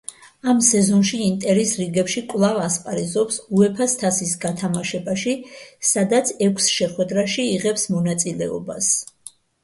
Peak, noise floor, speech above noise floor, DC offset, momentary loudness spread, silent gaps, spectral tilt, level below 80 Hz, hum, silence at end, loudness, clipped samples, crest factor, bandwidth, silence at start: -2 dBFS; -45 dBFS; 25 dB; under 0.1%; 8 LU; none; -4 dB/octave; -60 dBFS; none; 0.35 s; -20 LUFS; under 0.1%; 18 dB; 11.5 kHz; 0.1 s